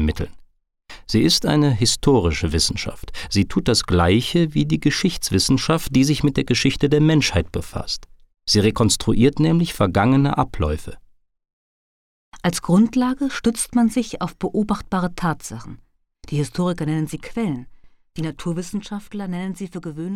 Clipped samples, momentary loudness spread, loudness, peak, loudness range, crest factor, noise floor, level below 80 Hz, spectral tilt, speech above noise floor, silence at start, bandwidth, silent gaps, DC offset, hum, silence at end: under 0.1%; 13 LU; -20 LUFS; -4 dBFS; 8 LU; 16 dB; -52 dBFS; -36 dBFS; -5 dB/octave; 32 dB; 0 s; 16.5 kHz; 11.53-12.32 s; under 0.1%; none; 0 s